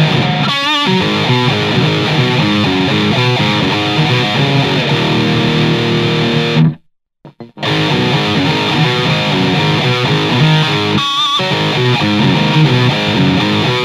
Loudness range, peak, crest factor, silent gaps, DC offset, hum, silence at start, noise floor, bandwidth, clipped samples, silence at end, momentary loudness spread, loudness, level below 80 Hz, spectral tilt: 2 LU; 0 dBFS; 12 dB; none; under 0.1%; none; 0 s; -46 dBFS; 13 kHz; under 0.1%; 0 s; 2 LU; -12 LUFS; -44 dBFS; -5.5 dB/octave